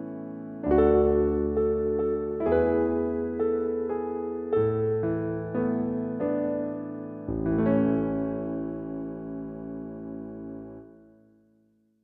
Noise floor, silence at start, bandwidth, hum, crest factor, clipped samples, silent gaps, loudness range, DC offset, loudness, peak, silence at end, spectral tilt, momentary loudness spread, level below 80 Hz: -66 dBFS; 0 s; 3.8 kHz; none; 18 dB; under 0.1%; none; 10 LU; under 0.1%; -27 LUFS; -10 dBFS; 1.1 s; -12 dB/octave; 14 LU; -46 dBFS